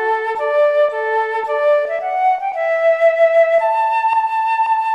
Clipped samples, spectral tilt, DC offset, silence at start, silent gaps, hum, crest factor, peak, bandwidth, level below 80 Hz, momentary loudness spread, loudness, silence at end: under 0.1%; -1.5 dB/octave; under 0.1%; 0 s; none; none; 12 dB; -4 dBFS; 8.6 kHz; -70 dBFS; 6 LU; -16 LUFS; 0 s